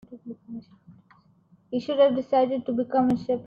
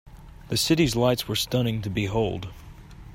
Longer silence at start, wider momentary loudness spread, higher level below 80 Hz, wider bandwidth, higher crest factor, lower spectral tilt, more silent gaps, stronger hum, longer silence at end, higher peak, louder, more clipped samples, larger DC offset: about the same, 0.1 s vs 0.05 s; first, 20 LU vs 8 LU; second, -64 dBFS vs -44 dBFS; second, 6.8 kHz vs 16 kHz; about the same, 18 dB vs 18 dB; first, -8 dB/octave vs -5 dB/octave; neither; neither; about the same, 0 s vs 0 s; about the same, -10 dBFS vs -8 dBFS; about the same, -24 LUFS vs -24 LUFS; neither; neither